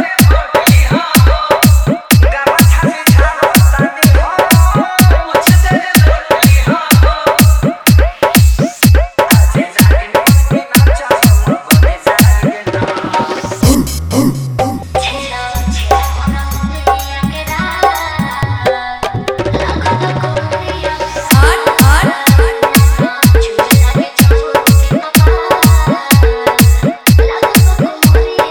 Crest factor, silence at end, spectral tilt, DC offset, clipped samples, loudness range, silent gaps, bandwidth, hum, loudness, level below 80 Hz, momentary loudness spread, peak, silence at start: 10 dB; 0 s; -5 dB/octave; under 0.1%; 0.7%; 6 LU; none; over 20 kHz; none; -10 LUFS; -14 dBFS; 8 LU; 0 dBFS; 0 s